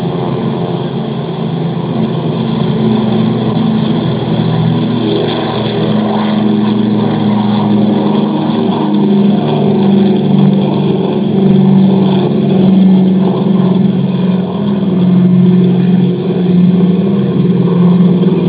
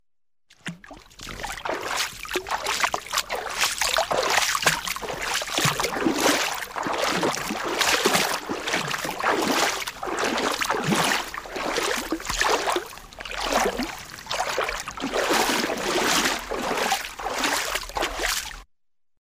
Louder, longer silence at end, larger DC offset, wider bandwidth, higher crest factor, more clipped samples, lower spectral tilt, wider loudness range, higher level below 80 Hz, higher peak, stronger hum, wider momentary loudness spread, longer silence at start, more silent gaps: first, -11 LUFS vs -24 LUFS; second, 0 s vs 0.55 s; neither; second, 4 kHz vs 16 kHz; second, 10 dB vs 20 dB; neither; first, -12.5 dB/octave vs -2 dB/octave; about the same, 4 LU vs 3 LU; about the same, -46 dBFS vs -48 dBFS; first, 0 dBFS vs -6 dBFS; neither; second, 7 LU vs 10 LU; second, 0 s vs 0.65 s; neither